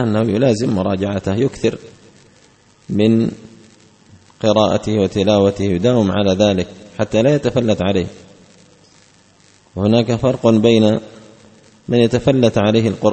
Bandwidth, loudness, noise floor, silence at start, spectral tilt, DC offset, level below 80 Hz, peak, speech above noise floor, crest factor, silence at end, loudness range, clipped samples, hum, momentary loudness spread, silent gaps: 8.8 kHz; -16 LUFS; -51 dBFS; 0 s; -6.5 dB/octave; under 0.1%; -46 dBFS; 0 dBFS; 36 dB; 16 dB; 0 s; 5 LU; under 0.1%; none; 8 LU; none